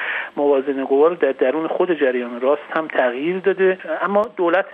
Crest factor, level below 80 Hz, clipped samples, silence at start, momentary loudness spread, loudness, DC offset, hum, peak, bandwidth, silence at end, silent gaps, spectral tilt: 16 dB; -72 dBFS; under 0.1%; 0 s; 5 LU; -19 LUFS; under 0.1%; none; -4 dBFS; 4.1 kHz; 0 s; none; -8 dB/octave